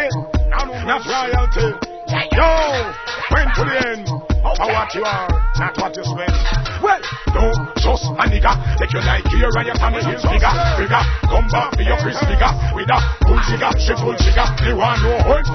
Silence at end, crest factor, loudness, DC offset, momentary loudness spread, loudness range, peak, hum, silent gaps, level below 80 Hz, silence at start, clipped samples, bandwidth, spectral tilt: 0 s; 14 dB; -17 LUFS; under 0.1%; 5 LU; 3 LU; -2 dBFS; none; none; -18 dBFS; 0 s; under 0.1%; 6.4 kHz; -5.5 dB/octave